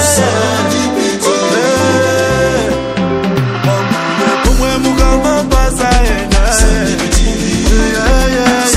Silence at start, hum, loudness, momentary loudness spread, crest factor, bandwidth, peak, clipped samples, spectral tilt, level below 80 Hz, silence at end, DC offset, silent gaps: 0 s; none; -12 LUFS; 3 LU; 10 dB; 15 kHz; 0 dBFS; under 0.1%; -4 dB/octave; -16 dBFS; 0 s; under 0.1%; none